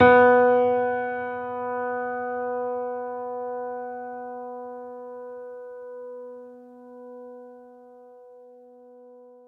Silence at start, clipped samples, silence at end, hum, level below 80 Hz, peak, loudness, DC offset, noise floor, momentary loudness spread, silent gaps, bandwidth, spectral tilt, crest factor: 0 s; under 0.1%; 0.2 s; none; -68 dBFS; -4 dBFS; -25 LUFS; under 0.1%; -49 dBFS; 24 LU; none; 4.1 kHz; -8 dB/octave; 22 dB